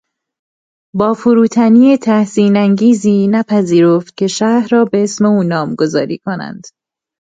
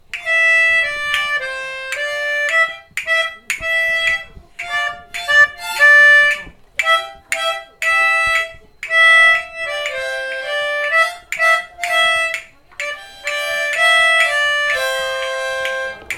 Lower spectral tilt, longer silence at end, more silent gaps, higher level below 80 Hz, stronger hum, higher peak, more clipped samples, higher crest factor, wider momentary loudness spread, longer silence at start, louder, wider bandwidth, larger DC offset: first, -6.5 dB/octave vs 1 dB/octave; first, 0.65 s vs 0 s; neither; second, -56 dBFS vs -50 dBFS; neither; about the same, 0 dBFS vs 0 dBFS; neither; about the same, 12 dB vs 16 dB; second, 9 LU vs 14 LU; first, 0.95 s vs 0.15 s; about the same, -12 LUFS vs -14 LUFS; second, 9.2 kHz vs 17 kHz; neither